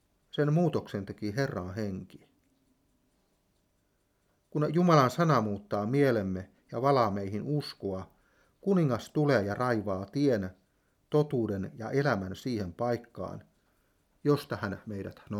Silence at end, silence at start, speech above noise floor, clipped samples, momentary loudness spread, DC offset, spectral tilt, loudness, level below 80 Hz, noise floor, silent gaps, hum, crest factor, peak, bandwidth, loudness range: 0 s; 0.35 s; 44 dB; under 0.1%; 13 LU; under 0.1%; -7.5 dB/octave; -30 LUFS; -68 dBFS; -73 dBFS; none; none; 22 dB; -10 dBFS; 15.5 kHz; 8 LU